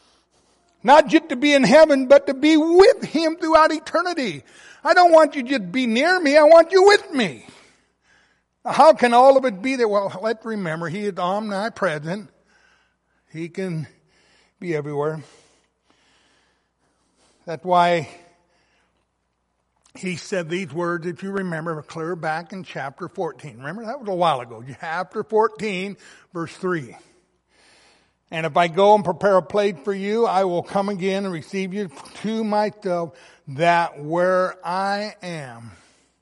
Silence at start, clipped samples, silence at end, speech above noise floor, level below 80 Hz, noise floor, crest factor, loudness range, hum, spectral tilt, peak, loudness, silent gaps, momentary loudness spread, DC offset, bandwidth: 0.85 s; under 0.1%; 0.5 s; 53 dB; -62 dBFS; -72 dBFS; 18 dB; 15 LU; none; -5 dB/octave; -2 dBFS; -19 LUFS; none; 19 LU; under 0.1%; 11.5 kHz